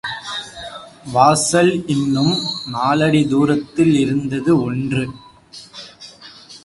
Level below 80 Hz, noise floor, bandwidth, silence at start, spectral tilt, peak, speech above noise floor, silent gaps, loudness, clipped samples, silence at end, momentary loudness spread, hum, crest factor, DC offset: -50 dBFS; -41 dBFS; 11.5 kHz; 0.05 s; -5 dB/octave; 0 dBFS; 25 dB; none; -17 LUFS; under 0.1%; 0.05 s; 22 LU; none; 18 dB; under 0.1%